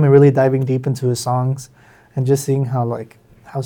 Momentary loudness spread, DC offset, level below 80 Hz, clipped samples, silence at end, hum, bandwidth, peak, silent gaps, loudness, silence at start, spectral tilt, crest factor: 17 LU; under 0.1%; -60 dBFS; under 0.1%; 0 s; none; 16.5 kHz; 0 dBFS; none; -17 LUFS; 0 s; -7.5 dB/octave; 16 dB